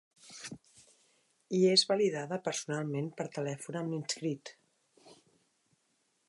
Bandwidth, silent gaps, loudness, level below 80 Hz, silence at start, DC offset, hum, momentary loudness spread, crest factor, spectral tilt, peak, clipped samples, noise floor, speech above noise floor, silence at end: 11.5 kHz; none; -32 LUFS; -82 dBFS; 0.25 s; under 0.1%; none; 21 LU; 24 dB; -4 dB/octave; -12 dBFS; under 0.1%; -76 dBFS; 44 dB; 1.15 s